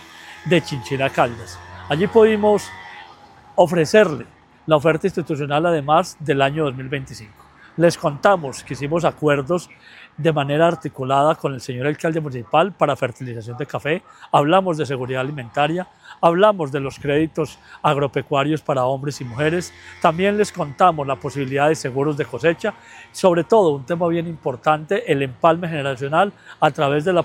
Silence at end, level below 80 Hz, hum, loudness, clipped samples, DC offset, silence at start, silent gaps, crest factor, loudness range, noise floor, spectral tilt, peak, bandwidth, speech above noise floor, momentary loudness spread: 0 s; -56 dBFS; none; -19 LUFS; under 0.1%; under 0.1%; 0 s; none; 20 dB; 2 LU; -45 dBFS; -6 dB/octave; 0 dBFS; 16 kHz; 26 dB; 12 LU